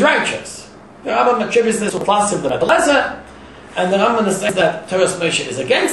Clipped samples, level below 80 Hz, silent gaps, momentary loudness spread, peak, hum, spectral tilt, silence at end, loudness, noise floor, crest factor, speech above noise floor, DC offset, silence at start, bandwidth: under 0.1%; -50 dBFS; none; 12 LU; -2 dBFS; none; -3.5 dB/octave; 0 s; -16 LUFS; -38 dBFS; 16 dB; 22 dB; 0.2%; 0 s; 12.5 kHz